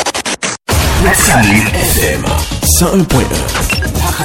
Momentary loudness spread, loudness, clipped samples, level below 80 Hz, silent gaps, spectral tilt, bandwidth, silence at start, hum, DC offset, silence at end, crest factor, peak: 7 LU; -11 LUFS; under 0.1%; -20 dBFS; none; -3.5 dB/octave; 17.5 kHz; 0 s; none; under 0.1%; 0 s; 12 dB; 0 dBFS